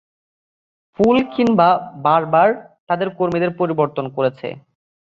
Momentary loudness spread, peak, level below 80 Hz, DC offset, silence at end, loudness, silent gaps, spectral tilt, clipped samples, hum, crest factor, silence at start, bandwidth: 8 LU; -2 dBFS; -58 dBFS; under 0.1%; 0.5 s; -17 LUFS; 2.80-2.87 s; -8 dB/octave; under 0.1%; none; 16 dB; 1 s; 7.4 kHz